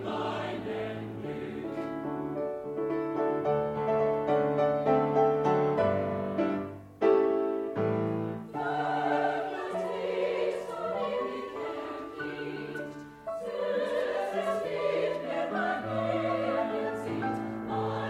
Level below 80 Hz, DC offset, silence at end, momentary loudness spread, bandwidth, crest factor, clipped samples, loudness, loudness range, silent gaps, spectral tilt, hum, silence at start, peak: -66 dBFS; under 0.1%; 0 s; 11 LU; 12.5 kHz; 18 dB; under 0.1%; -31 LUFS; 7 LU; none; -7 dB/octave; none; 0 s; -12 dBFS